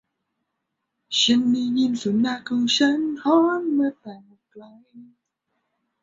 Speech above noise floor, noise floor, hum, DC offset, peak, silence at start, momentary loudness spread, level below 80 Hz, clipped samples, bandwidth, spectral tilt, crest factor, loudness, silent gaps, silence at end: 57 dB; -79 dBFS; none; under 0.1%; -6 dBFS; 1.1 s; 7 LU; -68 dBFS; under 0.1%; 8 kHz; -3.5 dB/octave; 18 dB; -21 LUFS; none; 1 s